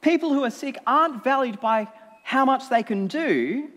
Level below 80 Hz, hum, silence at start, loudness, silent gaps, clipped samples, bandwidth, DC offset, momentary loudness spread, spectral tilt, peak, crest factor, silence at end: -84 dBFS; none; 0.05 s; -23 LUFS; none; under 0.1%; 14 kHz; under 0.1%; 7 LU; -5.5 dB/octave; -6 dBFS; 16 dB; 0.05 s